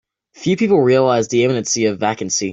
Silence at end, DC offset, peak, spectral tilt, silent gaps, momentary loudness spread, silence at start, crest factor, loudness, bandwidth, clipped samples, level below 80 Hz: 0 s; under 0.1%; -2 dBFS; -4.5 dB/octave; none; 8 LU; 0.4 s; 14 dB; -16 LUFS; 8.2 kHz; under 0.1%; -58 dBFS